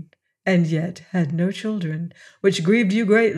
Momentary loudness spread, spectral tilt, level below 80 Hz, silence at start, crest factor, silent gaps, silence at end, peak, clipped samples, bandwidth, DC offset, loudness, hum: 11 LU; -6.5 dB/octave; -72 dBFS; 0 s; 16 dB; none; 0 s; -4 dBFS; under 0.1%; 11.5 kHz; under 0.1%; -21 LUFS; none